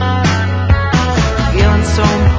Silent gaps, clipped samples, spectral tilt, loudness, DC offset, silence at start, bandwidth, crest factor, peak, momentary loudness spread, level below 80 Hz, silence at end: none; under 0.1%; -6 dB/octave; -13 LUFS; under 0.1%; 0 s; 8 kHz; 12 dB; 0 dBFS; 2 LU; -16 dBFS; 0 s